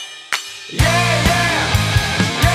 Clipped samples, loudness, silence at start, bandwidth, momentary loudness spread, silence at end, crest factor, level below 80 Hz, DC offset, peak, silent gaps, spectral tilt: under 0.1%; -16 LUFS; 0 s; 16 kHz; 9 LU; 0 s; 14 dB; -28 dBFS; under 0.1%; -2 dBFS; none; -4 dB/octave